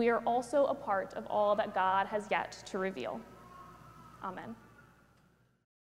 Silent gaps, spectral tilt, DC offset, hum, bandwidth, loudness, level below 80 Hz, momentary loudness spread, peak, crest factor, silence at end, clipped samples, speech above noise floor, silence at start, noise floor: none; -5 dB/octave; under 0.1%; none; 15 kHz; -33 LUFS; -68 dBFS; 23 LU; -16 dBFS; 18 dB; 1.3 s; under 0.1%; 35 dB; 0 s; -68 dBFS